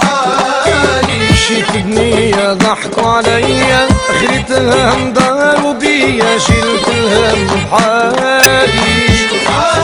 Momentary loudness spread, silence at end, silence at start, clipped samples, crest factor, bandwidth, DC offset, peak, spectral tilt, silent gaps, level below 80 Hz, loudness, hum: 3 LU; 0 s; 0 s; 0.6%; 10 dB; over 20 kHz; under 0.1%; 0 dBFS; -4 dB/octave; none; -26 dBFS; -10 LUFS; none